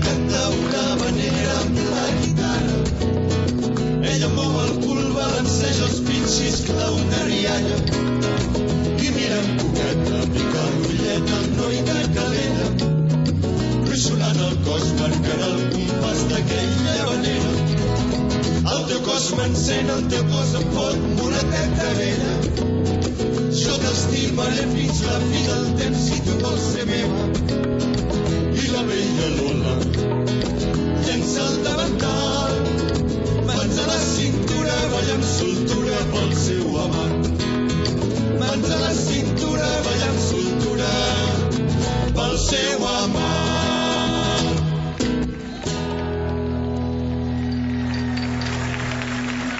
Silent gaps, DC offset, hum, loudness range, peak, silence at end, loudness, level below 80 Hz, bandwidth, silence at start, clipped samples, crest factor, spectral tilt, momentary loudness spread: none; under 0.1%; none; 1 LU; -6 dBFS; 0 s; -21 LUFS; -34 dBFS; 8 kHz; 0 s; under 0.1%; 14 dB; -5 dB/octave; 2 LU